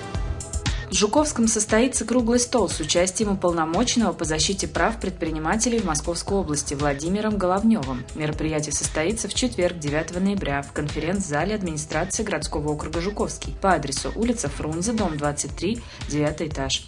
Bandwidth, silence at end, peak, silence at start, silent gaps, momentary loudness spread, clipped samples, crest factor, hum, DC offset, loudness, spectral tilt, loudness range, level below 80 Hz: 11 kHz; 0 s; -4 dBFS; 0 s; none; 7 LU; under 0.1%; 20 dB; none; under 0.1%; -24 LUFS; -4 dB/octave; 4 LU; -36 dBFS